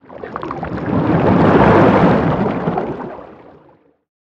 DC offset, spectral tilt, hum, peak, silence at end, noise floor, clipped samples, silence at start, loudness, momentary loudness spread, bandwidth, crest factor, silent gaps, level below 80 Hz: under 0.1%; -9 dB/octave; none; 0 dBFS; 0.95 s; -51 dBFS; under 0.1%; 0.1 s; -14 LUFS; 18 LU; 7.4 kHz; 16 dB; none; -36 dBFS